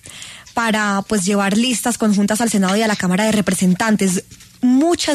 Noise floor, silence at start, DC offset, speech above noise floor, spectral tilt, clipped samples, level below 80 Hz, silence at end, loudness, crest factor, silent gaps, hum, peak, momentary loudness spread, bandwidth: -36 dBFS; 0.05 s; under 0.1%; 20 dB; -4.5 dB/octave; under 0.1%; -50 dBFS; 0 s; -17 LUFS; 12 dB; none; none; -4 dBFS; 5 LU; 13.5 kHz